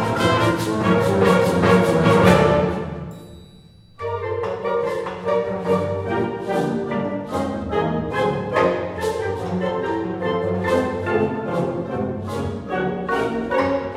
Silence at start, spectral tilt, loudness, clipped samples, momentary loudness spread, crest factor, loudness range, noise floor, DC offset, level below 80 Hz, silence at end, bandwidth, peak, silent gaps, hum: 0 s; -6.5 dB/octave; -21 LUFS; under 0.1%; 10 LU; 20 dB; 6 LU; -47 dBFS; under 0.1%; -44 dBFS; 0 s; 15.5 kHz; 0 dBFS; none; none